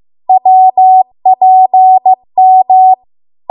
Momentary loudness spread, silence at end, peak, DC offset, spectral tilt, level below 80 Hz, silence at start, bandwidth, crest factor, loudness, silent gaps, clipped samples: 5 LU; 0.55 s; 0 dBFS; under 0.1%; -9 dB/octave; -68 dBFS; 0.3 s; 1 kHz; 6 dB; -7 LUFS; none; under 0.1%